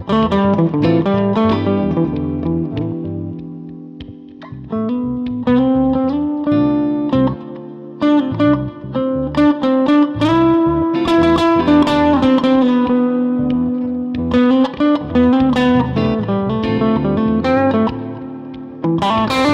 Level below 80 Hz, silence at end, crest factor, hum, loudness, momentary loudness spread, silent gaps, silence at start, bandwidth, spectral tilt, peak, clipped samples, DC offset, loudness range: -38 dBFS; 0 s; 14 dB; none; -15 LUFS; 15 LU; none; 0 s; 9 kHz; -8 dB/octave; -2 dBFS; under 0.1%; under 0.1%; 7 LU